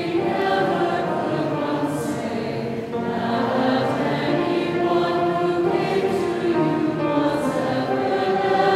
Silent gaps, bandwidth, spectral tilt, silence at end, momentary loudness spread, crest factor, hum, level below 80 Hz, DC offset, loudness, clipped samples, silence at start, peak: none; 14 kHz; -6.5 dB/octave; 0 s; 5 LU; 16 dB; none; -56 dBFS; under 0.1%; -22 LUFS; under 0.1%; 0 s; -6 dBFS